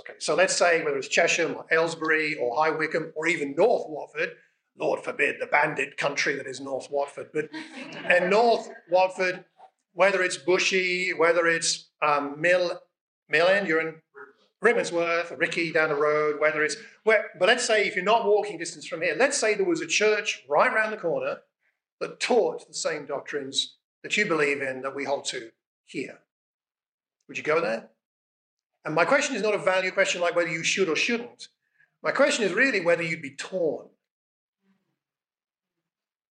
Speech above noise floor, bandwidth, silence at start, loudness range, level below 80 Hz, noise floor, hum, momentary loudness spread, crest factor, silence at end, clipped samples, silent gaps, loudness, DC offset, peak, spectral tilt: over 65 dB; 10 kHz; 0.05 s; 6 LU; -88 dBFS; under -90 dBFS; none; 12 LU; 22 dB; 2.45 s; under 0.1%; 13.01-13.22 s, 21.92-21.98 s, 23.84-24.02 s, 25.66-25.84 s, 26.32-26.59 s, 26.88-26.98 s, 28.05-28.57 s, 28.66-28.70 s; -24 LUFS; under 0.1%; -6 dBFS; -2.5 dB/octave